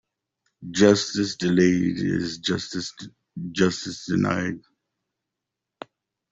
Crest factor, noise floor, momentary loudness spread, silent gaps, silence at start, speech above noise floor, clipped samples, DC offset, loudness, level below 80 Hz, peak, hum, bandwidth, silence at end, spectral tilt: 22 dB; -85 dBFS; 24 LU; none; 0.6 s; 62 dB; under 0.1%; under 0.1%; -23 LUFS; -60 dBFS; -4 dBFS; none; 8 kHz; 1.7 s; -5 dB/octave